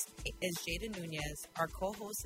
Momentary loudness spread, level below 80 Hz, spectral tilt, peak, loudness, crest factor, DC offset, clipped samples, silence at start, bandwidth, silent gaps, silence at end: 3 LU; -52 dBFS; -3.5 dB/octave; -22 dBFS; -39 LUFS; 20 dB; under 0.1%; under 0.1%; 0 s; 16 kHz; none; 0 s